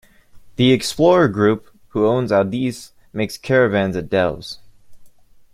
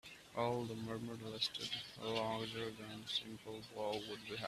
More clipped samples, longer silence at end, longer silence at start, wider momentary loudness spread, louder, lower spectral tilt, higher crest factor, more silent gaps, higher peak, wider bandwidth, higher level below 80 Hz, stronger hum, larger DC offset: neither; first, 0.45 s vs 0 s; first, 0.35 s vs 0.05 s; first, 17 LU vs 9 LU; first, -18 LUFS vs -43 LUFS; first, -6 dB/octave vs -4.5 dB/octave; about the same, 16 dB vs 20 dB; neither; first, -2 dBFS vs -24 dBFS; about the same, 15.5 kHz vs 14.5 kHz; first, -50 dBFS vs -74 dBFS; neither; neither